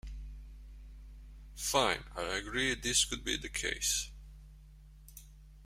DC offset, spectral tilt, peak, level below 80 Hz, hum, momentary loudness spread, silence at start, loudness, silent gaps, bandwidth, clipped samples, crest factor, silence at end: under 0.1%; -1.5 dB/octave; -14 dBFS; -50 dBFS; none; 25 LU; 0.05 s; -32 LUFS; none; 16 kHz; under 0.1%; 24 dB; 0 s